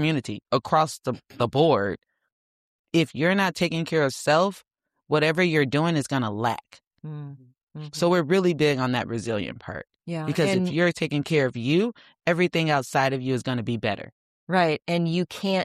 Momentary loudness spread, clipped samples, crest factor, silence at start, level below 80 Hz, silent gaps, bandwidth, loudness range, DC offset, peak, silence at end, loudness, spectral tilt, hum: 13 LU; under 0.1%; 18 dB; 0 s; -62 dBFS; 2.32-2.84 s, 6.87-6.91 s, 7.63-7.67 s, 14.12-14.47 s; 14.5 kHz; 2 LU; under 0.1%; -6 dBFS; 0 s; -24 LUFS; -6 dB/octave; none